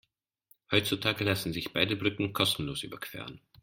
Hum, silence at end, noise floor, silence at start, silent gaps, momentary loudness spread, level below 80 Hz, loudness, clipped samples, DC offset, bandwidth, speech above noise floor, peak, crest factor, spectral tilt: none; 0.25 s; -67 dBFS; 0.7 s; none; 12 LU; -60 dBFS; -30 LUFS; under 0.1%; under 0.1%; 16.5 kHz; 36 dB; -10 dBFS; 22 dB; -4 dB/octave